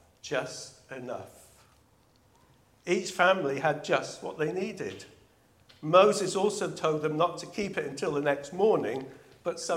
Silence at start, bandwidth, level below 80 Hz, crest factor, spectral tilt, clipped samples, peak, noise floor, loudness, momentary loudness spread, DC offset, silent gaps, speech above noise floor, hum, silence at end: 0.25 s; 15.5 kHz; -70 dBFS; 22 dB; -4.5 dB/octave; under 0.1%; -6 dBFS; -64 dBFS; -29 LUFS; 17 LU; under 0.1%; none; 35 dB; none; 0 s